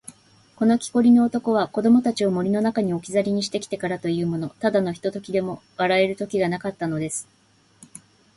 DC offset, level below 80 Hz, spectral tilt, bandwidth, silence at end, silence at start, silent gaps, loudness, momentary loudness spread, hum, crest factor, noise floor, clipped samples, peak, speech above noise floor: under 0.1%; -60 dBFS; -5.5 dB/octave; 11.5 kHz; 1.15 s; 0.1 s; none; -22 LUFS; 9 LU; none; 16 dB; -55 dBFS; under 0.1%; -6 dBFS; 33 dB